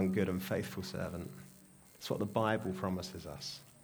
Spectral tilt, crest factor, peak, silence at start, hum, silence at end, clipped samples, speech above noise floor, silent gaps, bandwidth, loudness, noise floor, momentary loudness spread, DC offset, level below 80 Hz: -6 dB/octave; 20 dB; -18 dBFS; 0 s; none; 0.1 s; under 0.1%; 23 dB; none; over 20 kHz; -38 LUFS; -60 dBFS; 15 LU; under 0.1%; -64 dBFS